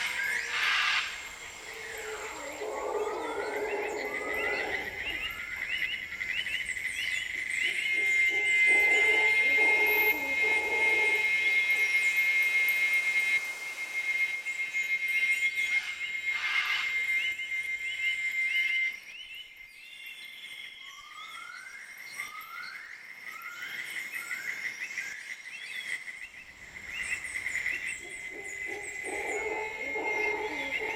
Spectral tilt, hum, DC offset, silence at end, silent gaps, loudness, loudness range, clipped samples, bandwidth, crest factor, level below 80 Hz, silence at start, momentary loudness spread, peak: -0.5 dB/octave; none; under 0.1%; 0 s; none; -28 LUFS; 15 LU; under 0.1%; 16.5 kHz; 16 dB; -64 dBFS; 0 s; 18 LU; -16 dBFS